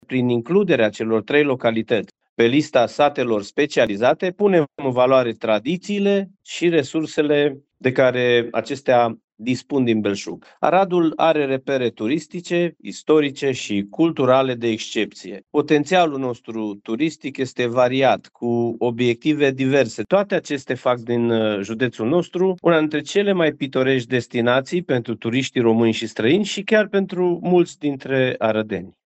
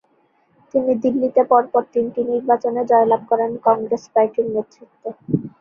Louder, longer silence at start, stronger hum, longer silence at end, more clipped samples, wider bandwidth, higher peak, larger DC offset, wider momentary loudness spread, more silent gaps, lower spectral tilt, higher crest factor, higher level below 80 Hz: about the same, -20 LUFS vs -19 LUFS; second, 0.1 s vs 0.75 s; neither; about the same, 0.15 s vs 0.1 s; neither; first, 8.4 kHz vs 6.8 kHz; about the same, 0 dBFS vs -2 dBFS; neither; about the same, 7 LU vs 9 LU; first, 2.29-2.36 s, 9.24-9.28 s vs none; second, -6 dB/octave vs -8.5 dB/octave; about the same, 18 dB vs 18 dB; about the same, -64 dBFS vs -62 dBFS